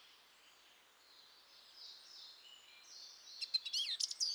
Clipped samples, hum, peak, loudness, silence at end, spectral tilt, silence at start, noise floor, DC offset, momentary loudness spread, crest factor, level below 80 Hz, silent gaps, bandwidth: under 0.1%; none; -20 dBFS; -41 LUFS; 0 s; 4.5 dB/octave; 0 s; -67 dBFS; under 0.1%; 26 LU; 26 dB; under -90 dBFS; none; over 20 kHz